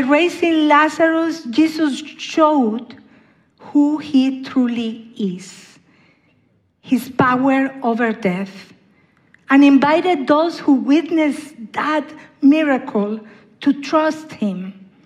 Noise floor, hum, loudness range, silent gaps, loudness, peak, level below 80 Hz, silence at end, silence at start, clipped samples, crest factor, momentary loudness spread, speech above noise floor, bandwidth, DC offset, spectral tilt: -60 dBFS; none; 5 LU; none; -17 LUFS; 0 dBFS; -64 dBFS; 0.35 s; 0 s; under 0.1%; 16 dB; 13 LU; 43 dB; 12.5 kHz; under 0.1%; -5.5 dB/octave